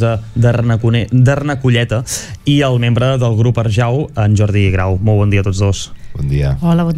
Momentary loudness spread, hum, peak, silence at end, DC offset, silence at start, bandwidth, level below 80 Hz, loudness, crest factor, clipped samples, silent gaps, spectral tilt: 5 LU; none; -2 dBFS; 0 s; under 0.1%; 0 s; 13 kHz; -30 dBFS; -14 LUFS; 12 dB; under 0.1%; none; -6.5 dB/octave